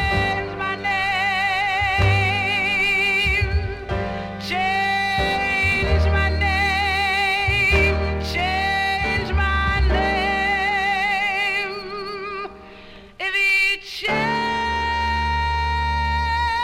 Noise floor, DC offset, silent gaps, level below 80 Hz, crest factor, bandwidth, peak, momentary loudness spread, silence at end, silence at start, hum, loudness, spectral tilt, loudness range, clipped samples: -42 dBFS; under 0.1%; none; -30 dBFS; 16 dB; 15.5 kHz; -4 dBFS; 9 LU; 0 s; 0 s; none; -20 LUFS; -5 dB/octave; 3 LU; under 0.1%